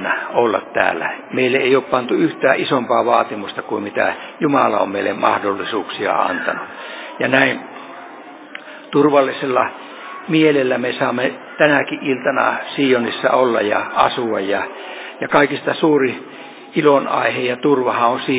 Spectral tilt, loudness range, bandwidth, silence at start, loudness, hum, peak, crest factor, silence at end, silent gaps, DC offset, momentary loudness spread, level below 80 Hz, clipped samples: -9 dB/octave; 2 LU; 4 kHz; 0 s; -17 LUFS; none; 0 dBFS; 18 dB; 0 s; none; under 0.1%; 16 LU; -62 dBFS; under 0.1%